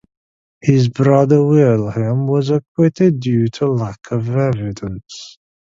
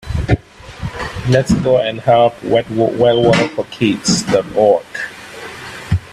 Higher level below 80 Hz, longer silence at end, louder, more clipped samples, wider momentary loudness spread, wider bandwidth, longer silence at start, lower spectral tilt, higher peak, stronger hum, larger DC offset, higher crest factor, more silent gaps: second, -50 dBFS vs -34 dBFS; first, 0.5 s vs 0 s; about the same, -16 LUFS vs -15 LUFS; neither; about the same, 14 LU vs 16 LU; second, 7.6 kHz vs 13.5 kHz; first, 0.65 s vs 0.05 s; first, -8.5 dB/octave vs -5.5 dB/octave; about the same, 0 dBFS vs 0 dBFS; neither; neither; about the same, 16 dB vs 14 dB; first, 2.68-2.75 s vs none